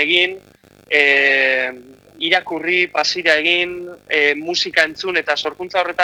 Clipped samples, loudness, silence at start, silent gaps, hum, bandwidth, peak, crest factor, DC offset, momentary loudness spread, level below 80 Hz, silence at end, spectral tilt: under 0.1%; -16 LUFS; 0 s; none; none; 17 kHz; 0 dBFS; 18 dB; under 0.1%; 9 LU; -62 dBFS; 0 s; -2 dB/octave